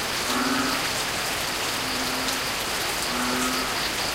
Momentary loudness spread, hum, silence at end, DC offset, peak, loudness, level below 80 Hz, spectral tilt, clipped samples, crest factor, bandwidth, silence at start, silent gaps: 2 LU; none; 0 s; under 0.1%; -10 dBFS; -24 LUFS; -48 dBFS; -1.5 dB/octave; under 0.1%; 16 dB; 16.5 kHz; 0 s; none